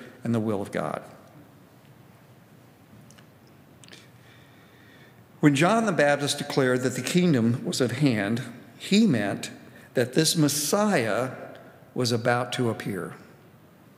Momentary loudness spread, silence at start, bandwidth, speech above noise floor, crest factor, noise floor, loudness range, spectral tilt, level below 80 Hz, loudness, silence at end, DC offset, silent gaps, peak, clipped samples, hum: 14 LU; 0 s; 16 kHz; 29 dB; 22 dB; -53 dBFS; 10 LU; -5 dB/octave; -74 dBFS; -24 LUFS; 0.75 s; under 0.1%; none; -6 dBFS; under 0.1%; none